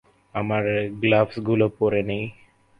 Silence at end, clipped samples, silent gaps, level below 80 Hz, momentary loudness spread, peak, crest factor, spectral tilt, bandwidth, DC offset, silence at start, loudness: 0.45 s; under 0.1%; none; -54 dBFS; 10 LU; -6 dBFS; 18 dB; -9 dB/octave; 5.4 kHz; under 0.1%; 0.35 s; -23 LUFS